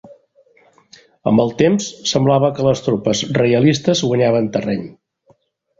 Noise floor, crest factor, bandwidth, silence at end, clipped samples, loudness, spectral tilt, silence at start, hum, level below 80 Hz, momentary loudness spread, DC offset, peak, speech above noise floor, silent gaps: -57 dBFS; 16 dB; 8 kHz; 0.9 s; under 0.1%; -16 LUFS; -5.5 dB/octave; 0.05 s; none; -52 dBFS; 7 LU; under 0.1%; -2 dBFS; 42 dB; none